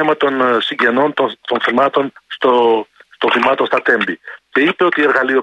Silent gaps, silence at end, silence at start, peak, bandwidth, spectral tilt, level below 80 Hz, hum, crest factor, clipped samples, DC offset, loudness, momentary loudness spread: none; 0 s; 0 s; -2 dBFS; 9.4 kHz; -5.5 dB/octave; -64 dBFS; none; 14 dB; under 0.1%; under 0.1%; -15 LUFS; 7 LU